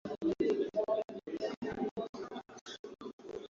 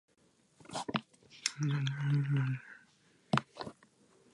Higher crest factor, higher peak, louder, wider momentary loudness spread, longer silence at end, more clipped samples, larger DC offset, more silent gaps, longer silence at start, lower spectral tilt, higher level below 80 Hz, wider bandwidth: second, 18 dB vs 26 dB; second, -20 dBFS vs -12 dBFS; about the same, -38 LUFS vs -36 LUFS; about the same, 15 LU vs 15 LU; second, 0.05 s vs 0.6 s; neither; neither; first, 1.57-1.62 s, 1.91-1.96 s, 2.09-2.13 s, 2.61-2.66 s, 2.79-2.84 s, 3.13-3.19 s vs none; second, 0.05 s vs 0.7 s; about the same, -5 dB/octave vs -5 dB/octave; first, -68 dBFS vs -74 dBFS; second, 7.6 kHz vs 11.5 kHz